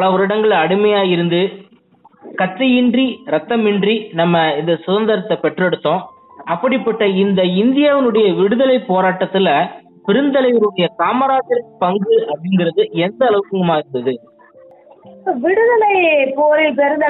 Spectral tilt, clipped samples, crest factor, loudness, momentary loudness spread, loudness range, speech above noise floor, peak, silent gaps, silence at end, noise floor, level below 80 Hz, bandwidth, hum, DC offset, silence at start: -11 dB/octave; under 0.1%; 12 dB; -15 LUFS; 8 LU; 3 LU; 35 dB; -2 dBFS; none; 0 s; -49 dBFS; -64 dBFS; 4.1 kHz; none; under 0.1%; 0 s